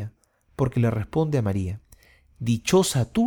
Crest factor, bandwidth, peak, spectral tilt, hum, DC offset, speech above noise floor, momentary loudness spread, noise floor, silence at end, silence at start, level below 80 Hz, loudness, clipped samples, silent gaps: 16 dB; 19 kHz; -8 dBFS; -6 dB/octave; none; under 0.1%; 32 dB; 16 LU; -55 dBFS; 0 s; 0 s; -48 dBFS; -24 LUFS; under 0.1%; none